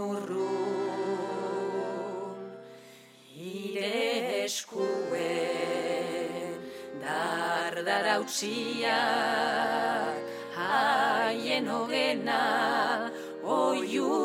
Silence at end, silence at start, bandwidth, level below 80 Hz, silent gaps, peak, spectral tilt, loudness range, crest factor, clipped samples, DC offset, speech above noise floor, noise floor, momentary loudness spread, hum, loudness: 0 s; 0 s; 16 kHz; -82 dBFS; none; -12 dBFS; -3 dB/octave; 6 LU; 18 dB; under 0.1%; under 0.1%; 25 dB; -53 dBFS; 11 LU; none; -30 LUFS